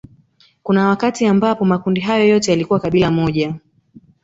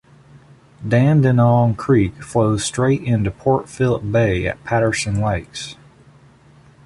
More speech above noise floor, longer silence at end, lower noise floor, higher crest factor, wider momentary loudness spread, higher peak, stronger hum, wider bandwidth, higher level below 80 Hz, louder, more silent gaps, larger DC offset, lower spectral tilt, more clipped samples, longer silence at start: first, 39 dB vs 31 dB; second, 0.65 s vs 1.1 s; first, -54 dBFS vs -48 dBFS; about the same, 14 dB vs 16 dB; about the same, 7 LU vs 8 LU; about the same, -2 dBFS vs -4 dBFS; neither; second, 8 kHz vs 11.5 kHz; second, -48 dBFS vs -40 dBFS; about the same, -16 LUFS vs -18 LUFS; neither; neither; about the same, -6 dB/octave vs -6.5 dB/octave; neither; second, 0.65 s vs 0.8 s